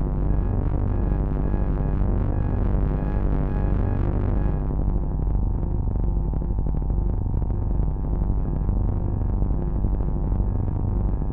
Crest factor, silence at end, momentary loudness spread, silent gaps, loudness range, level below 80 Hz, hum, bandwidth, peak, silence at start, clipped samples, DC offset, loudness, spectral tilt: 14 dB; 0 s; 2 LU; none; 1 LU; -24 dBFS; none; 2.6 kHz; -8 dBFS; 0 s; under 0.1%; under 0.1%; -26 LUFS; -12.5 dB/octave